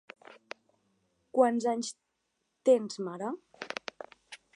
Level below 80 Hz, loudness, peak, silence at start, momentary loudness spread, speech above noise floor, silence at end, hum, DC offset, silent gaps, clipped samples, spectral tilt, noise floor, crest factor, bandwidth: -86 dBFS; -31 LUFS; -10 dBFS; 0.3 s; 23 LU; 52 dB; 0.2 s; none; under 0.1%; none; under 0.1%; -4 dB/octave; -80 dBFS; 22 dB; 11 kHz